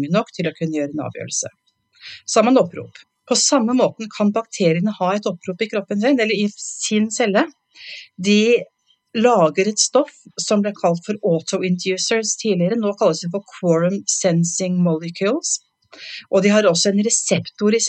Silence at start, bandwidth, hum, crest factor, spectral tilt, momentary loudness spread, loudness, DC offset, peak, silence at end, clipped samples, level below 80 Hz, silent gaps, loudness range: 0 s; 9.4 kHz; none; 18 dB; -4 dB/octave; 11 LU; -19 LUFS; under 0.1%; -2 dBFS; 0 s; under 0.1%; -76 dBFS; none; 2 LU